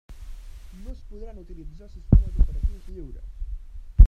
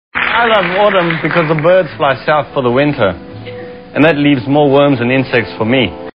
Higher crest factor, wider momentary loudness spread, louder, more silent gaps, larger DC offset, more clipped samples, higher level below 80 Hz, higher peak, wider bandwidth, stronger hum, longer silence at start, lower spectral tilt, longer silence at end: first, 22 dB vs 12 dB; first, 24 LU vs 9 LU; second, -26 LUFS vs -12 LUFS; neither; second, under 0.1% vs 0.5%; neither; first, -24 dBFS vs -44 dBFS; about the same, 0 dBFS vs 0 dBFS; second, 1.5 kHz vs 5.4 kHz; neither; about the same, 0.1 s vs 0.15 s; about the same, -10 dB/octave vs -9 dB/octave; about the same, 0 s vs 0.1 s